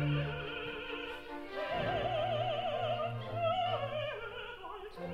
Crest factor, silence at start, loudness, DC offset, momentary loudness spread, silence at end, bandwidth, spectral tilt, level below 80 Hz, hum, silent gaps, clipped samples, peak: 14 dB; 0 s; -37 LUFS; under 0.1%; 10 LU; 0 s; 13 kHz; -7 dB/octave; -56 dBFS; none; none; under 0.1%; -22 dBFS